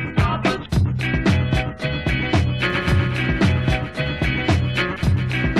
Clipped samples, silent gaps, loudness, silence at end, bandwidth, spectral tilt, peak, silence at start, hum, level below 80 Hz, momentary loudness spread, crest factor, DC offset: under 0.1%; none; -20 LUFS; 0 s; 12.5 kHz; -6.5 dB/octave; -6 dBFS; 0 s; none; -30 dBFS; 4 LU; 12 dB; under 0.1%